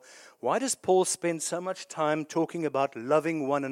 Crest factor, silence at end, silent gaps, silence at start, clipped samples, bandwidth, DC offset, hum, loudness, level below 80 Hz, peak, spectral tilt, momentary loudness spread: 18 dB; 0 s; none; 0.1 s; under 0.1%; 16 kHz; under 0.1%; none; -28 LUFS; -80 dBFS; -12 dBFS; -4 dB/octave; 7 LU